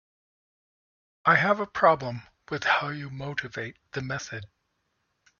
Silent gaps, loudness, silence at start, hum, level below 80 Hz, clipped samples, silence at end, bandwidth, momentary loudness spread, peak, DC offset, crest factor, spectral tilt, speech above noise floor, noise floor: none; -26 LUFS; 1.25 s; none; -64 dBFS; under 0.1%; 0.95 s; 7.2 kHz; 15 LU; -4 dBFS; under 0.1%; 24 dB; -5 dB/octave; 49 dB; -76 dBFS